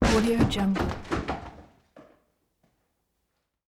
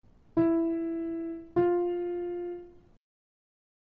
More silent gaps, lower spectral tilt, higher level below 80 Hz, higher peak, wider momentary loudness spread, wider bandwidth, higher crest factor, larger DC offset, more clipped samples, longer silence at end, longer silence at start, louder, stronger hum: neither; second, -5.5 dB/octave vs -11 dB/octave; first, -40 dBFS vs -62 dBFS; first, -10 dBFS vs -14 dBFS; first, 14 LU vs 10 LU; first, 15.5 kHz vs 3.1 kHz; about the same, 20 dB vs 18 dB; neither; neither; first, 1.65 s vs 1.15 s; second, 0 s vs 0.35 s; first, -27 LUFS vs -30 LUFS; neither